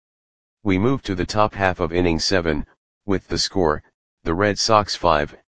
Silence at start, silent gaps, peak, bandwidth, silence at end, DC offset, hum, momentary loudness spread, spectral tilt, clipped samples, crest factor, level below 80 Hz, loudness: 0.55 s; 2.77-3.01 s, 3.94-4.17 s; 0 dBFS; 10 kHz; 0.05 s; 1%; none; 11 LU; -4.5 dB/octave; under 0.1%; 20 dB; -40 dBFS; -21 LUFS